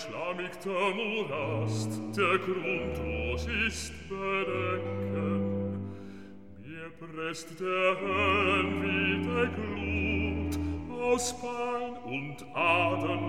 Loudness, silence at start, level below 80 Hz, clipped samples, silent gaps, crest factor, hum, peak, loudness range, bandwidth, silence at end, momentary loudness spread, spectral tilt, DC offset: -30 LUFS; 0 s; -48 dBFS; under 0.1%; none; 18 dB; none; -14 dBFS; 5 LU; 16 kHz; 0 s; 12 LU; -5 dB/octave; 0.3%